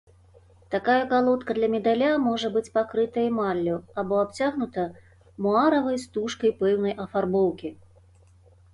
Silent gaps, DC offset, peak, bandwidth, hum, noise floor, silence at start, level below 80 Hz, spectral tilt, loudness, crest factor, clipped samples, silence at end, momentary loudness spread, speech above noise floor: none; under 0.1%; -8 dBFS; 11.5 kHz; none; -55 dBFS; 0.7 s; -58 dBFS; -6 dB/octave; -25 LUFS; 16 dB; under 0.1%; 1 s; 8 LU; 31 dB